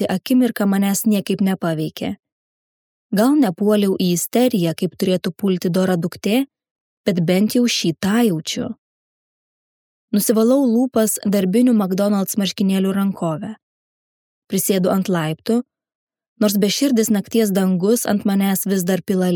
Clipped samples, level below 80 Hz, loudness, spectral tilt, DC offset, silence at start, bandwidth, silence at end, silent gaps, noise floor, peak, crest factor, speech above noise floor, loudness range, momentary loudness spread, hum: under 0.1%; -64 dBFS; -18 LUFS; -5.5 dB/octave; under 0.1%; 0 s; 19 kHz; 0 s; 2.32-3.10 s, 6.71-7.04 s, 8.78-10.08 s, 13.63-14.42 s, 15.95-16.07 s, 16.28-16.36 s; under -90 dBFS; -2 dBFS; 16 dB; over 73 dB; 3 LU; 8 LU; none